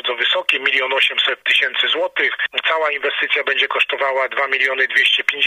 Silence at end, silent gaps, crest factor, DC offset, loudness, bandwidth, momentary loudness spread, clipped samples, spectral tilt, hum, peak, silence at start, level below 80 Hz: 0 s; none; 18 dB; under 0.1%; -16 LUFS; 15.5 kHz; 4 LU; under 0.1%; 0 dB/octave; none; 0 dBFS; 0.05 s; -74 dBFS